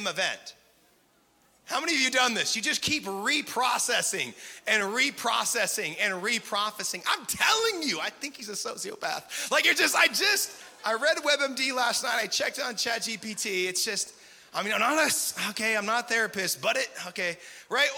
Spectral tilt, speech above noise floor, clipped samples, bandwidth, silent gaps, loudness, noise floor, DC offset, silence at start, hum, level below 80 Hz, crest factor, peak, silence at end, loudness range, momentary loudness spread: -0.5 dB/octave; 37 dB; under 0.1%; 17.5 kHz; none; -26 LUFS; -65 dBFS; under 0.1%; 0 s; none; -72 dBFS; 20 dB; -8 dBFS; 0 s; 3 LU; 10 LU